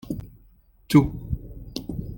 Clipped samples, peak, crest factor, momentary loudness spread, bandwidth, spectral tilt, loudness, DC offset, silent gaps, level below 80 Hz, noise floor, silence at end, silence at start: under 0.1%; -4 dBFS; 22 dB; 16 LU; 17 kHz; -7 dB/octave; -25 LUFS; under 0.1%; none; -40 dBFS; -56 dBFS; 0 s; 0.05 s